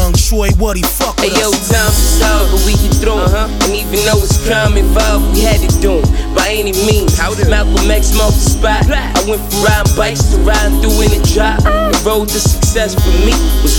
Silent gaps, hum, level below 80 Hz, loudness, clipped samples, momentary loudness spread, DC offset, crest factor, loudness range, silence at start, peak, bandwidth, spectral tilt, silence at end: none; none; -14 dBFS; -12 LUFS; under 0.1%; 2 LU; under 0.1%; 10 dB; 0 LU; 0 s; 0 dBFS; 19 kHz; -4.5 dB/octave; 0 s